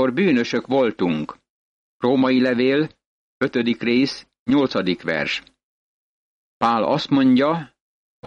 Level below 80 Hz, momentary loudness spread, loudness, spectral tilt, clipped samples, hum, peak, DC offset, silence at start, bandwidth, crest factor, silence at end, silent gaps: -60 dBFS; 9 LU; -20 LUFS; -6.5 dB/octave; under 0.1%; none; -8 dBFS; under 0.1%; 0 s; 7.6 kHz; 14 dB; 0 s; 1.50-2.00 s, 3.06-3.40 s, 4.39-4.46 s, 5.63-6.60 s, 7.81-8.23 s